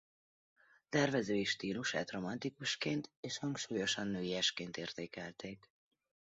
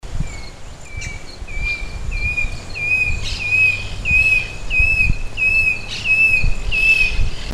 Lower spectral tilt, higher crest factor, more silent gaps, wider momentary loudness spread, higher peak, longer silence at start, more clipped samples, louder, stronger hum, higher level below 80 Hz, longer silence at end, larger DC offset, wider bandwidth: about the same, -3 dB/octave vs -3 dB/octave; first, 22 dB vs 16 dB; first, 3.17-3.23 s vs none; second, 12 LU vs 17 LU; second, -18 dBFS vs -2 dBFS; first, 0.9 s vs 0.05 s; neither; second, -38 LUFS vs -16 LUFS; neither; second, -74 dBFS vs -24 dBFS; first, 0.7 s vs 0 s; neither; second, 8 kHz vs 12.5 kHz